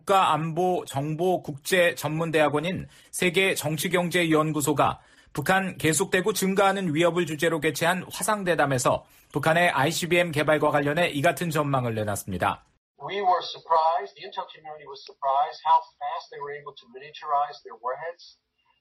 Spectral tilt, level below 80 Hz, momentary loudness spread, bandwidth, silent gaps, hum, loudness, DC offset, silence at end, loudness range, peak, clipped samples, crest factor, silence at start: -4.5 dB/octave; -60 dBFS; 14 LU; 15.5 kHz; 12.77-12.95 s; none; -24 LUFS; under 0.1%; 0.55 s; 5 LU; -10 dBFS; under 0.1%; 16 dB; 0.05 s